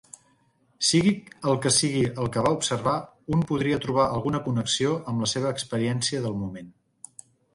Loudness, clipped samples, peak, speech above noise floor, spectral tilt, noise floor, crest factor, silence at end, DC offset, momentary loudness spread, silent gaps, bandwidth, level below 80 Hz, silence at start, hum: -25 LUFS; under 0.1%; -8 dBFS; 40 dB; -4.5 dB/octave; -65 dBFS; 18 dB; 0.85 s; under 0.1%; 10 LU; none; 11.5 kHz; -54 dBFS; 0.8 s; none